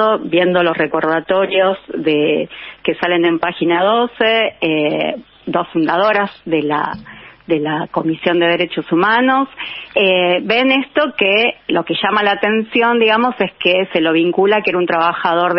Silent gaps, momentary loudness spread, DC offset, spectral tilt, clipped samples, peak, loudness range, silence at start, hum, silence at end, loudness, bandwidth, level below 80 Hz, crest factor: none; 7 LU; under 0.1%; -2.5 dB/octave; under 0.1%; 0 dBFS; 3 LU; 0 s; none; 0 s; -15 LUFS; 5.8 kHz; -58 dBFS; 14 dB